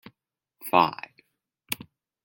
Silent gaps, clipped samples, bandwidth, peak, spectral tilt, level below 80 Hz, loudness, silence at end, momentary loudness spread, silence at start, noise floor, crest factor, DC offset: none; under 0.1%; 17 kHz; -4 dBFS; -4 dB/octave; -72 dBFS; -26 LUFS; 0.5 s; 19 LU; 0.65 s; -78 dBFS; 26 dB; under 0.1%